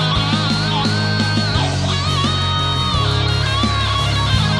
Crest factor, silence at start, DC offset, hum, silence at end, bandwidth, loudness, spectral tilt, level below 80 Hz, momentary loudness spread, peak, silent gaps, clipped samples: 14 dB; 0 s; under 0.1%; none; 0 s; 12 kHz; -17 LUFS; -5 dB/octave; -30 dBFS; 1 LU; -2 dBFS; none; under 0.1%